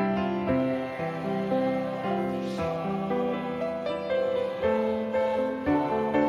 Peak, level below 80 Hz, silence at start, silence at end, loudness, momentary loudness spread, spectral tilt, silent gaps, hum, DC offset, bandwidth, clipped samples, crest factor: -12 dBFS; -58 dBFS; 0 s; 0 s; -28 LUFS; 4 LU; -7.5 dB/octave; none; none; under 0.1%; 12 kHz; under 0.1%; 14 dB